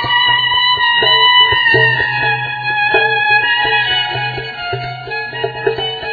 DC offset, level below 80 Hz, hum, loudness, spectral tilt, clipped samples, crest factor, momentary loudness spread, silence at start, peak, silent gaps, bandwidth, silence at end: under 0.1%; -46 dBFS; none; -12 LUFS; -5 dB/octave; under 0.1%; 14 dB; 13 LU; 0 s; 0 dBFS; none; 5 kHz; 0 s